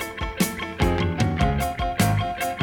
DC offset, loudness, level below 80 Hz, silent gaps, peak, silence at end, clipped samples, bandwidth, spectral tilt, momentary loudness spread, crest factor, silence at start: under 0.1%; -24 LUFS; -32 dBFS; none; -8 dBFS; 0 s; under 0.1%; over 20 kHz; -5.5 dB/octave; 4 LU; 16 dB; 0 s